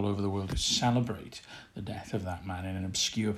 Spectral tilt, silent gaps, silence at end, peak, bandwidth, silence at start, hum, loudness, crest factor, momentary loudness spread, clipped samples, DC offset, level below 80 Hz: -4 dB/octave; none; 0 s; -16 dBFS; 15 kHz; 0 s; none; -32 LUFS; 16 dB; 16 LU; under 0.1%; under 0.1%; -48 dBFS